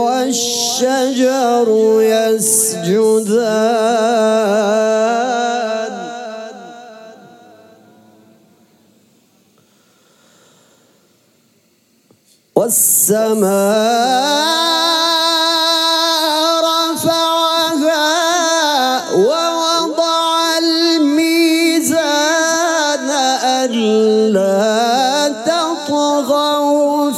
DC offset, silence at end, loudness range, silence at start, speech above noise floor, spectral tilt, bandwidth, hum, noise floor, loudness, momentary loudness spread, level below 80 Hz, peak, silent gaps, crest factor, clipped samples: under 0.1%; 0 s; 6 LU; 0 s; 43 dB; -2.5 dB/octave; 16.5 kHz; none; -56 dBFS; -13 LUFS; 4 LU; -70 dBFS; 0 dBFS; none; 14 dB; under 0.1%